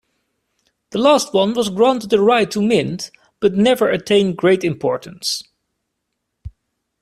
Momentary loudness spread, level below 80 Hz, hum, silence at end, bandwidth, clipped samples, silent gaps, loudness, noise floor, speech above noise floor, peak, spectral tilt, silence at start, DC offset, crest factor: 9 LU; -52 dBFS; none; 0.5 s; 14.5 kHz; under 0.1%; none; -17 LUFS; -75 dBFS; 59 dB; -2 dBFS; -5 dB/octave; 0.9 s; under 0.1%; 16 dB